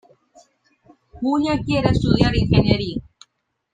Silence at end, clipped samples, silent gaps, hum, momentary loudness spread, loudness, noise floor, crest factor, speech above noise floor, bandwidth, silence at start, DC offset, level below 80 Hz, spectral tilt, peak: 0.75 s; under 0.1%; none; none; 10 LU; -19 LUFS; -68 dBFS; 20 dB; 50 dB; 9.4 kHz; 1.15 s; under 0.1%; -34 dBFS; -7.5 dB/octave; -2 dBFS